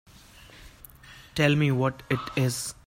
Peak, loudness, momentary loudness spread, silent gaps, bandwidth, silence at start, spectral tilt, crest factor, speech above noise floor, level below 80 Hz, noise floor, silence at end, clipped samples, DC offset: -8 dBFS; -26 LUFS; 18 LU; none; 16 kHz; 0.6 s; -5.5 dB/octave; 20 dB; 25 dB; -54 dBFS; -51 dBFS; 0.15 s; under 0.1%; under 0.1%